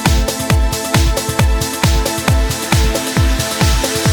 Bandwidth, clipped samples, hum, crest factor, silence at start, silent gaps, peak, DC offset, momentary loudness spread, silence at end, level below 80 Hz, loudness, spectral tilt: 19.5 kHz; under 0.1%; none; 14 dB; 0 s; none; 0 dBFS; under 0.1%; 1 LU; 0 s; -18 dBFS; -15 LUFS; -4 dB/octave